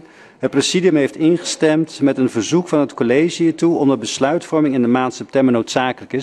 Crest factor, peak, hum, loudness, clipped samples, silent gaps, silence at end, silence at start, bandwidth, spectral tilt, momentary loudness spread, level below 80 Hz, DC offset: 16 dB; 0 dBFS; none; -17 LUFS; under 0.1%; none; 0 s; 0.4 s; 11.5 kHz; -5 dB/octave; 4 LU; -60 dBFS; under 0.1%